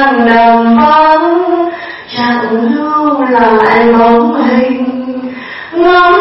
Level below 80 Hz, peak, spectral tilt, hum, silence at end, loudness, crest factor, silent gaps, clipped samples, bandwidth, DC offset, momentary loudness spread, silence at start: -42 dBFS; 0 dBFS; -7.5 dB/octave; none; 0 s; -8 LUFS; 8 dB; none; 0.2%; 5.8 kHz; under 0.1%; 13 LU; 0 s